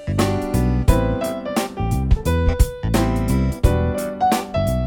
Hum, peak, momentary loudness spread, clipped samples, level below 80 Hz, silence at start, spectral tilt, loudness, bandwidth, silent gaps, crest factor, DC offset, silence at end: none; 0 dBFS; 5 LU; under 0.1%; -24 dBFS; 0 s; -6.5 dB/octave; -20 LUFS; 19.5 kHz; none; 18 dB; under 0.1%; 0 s